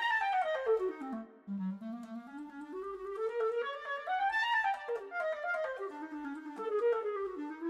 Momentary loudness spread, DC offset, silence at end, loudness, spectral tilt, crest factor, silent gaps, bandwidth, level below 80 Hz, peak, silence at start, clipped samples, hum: 13 LU; under 0.1%; 0 s; -36 LUFS; -5.5 dB/octave; 14 dB; none; 11.5 kHz; -76 dBFS; -22 dBFS; 0 s; under 0.1%; none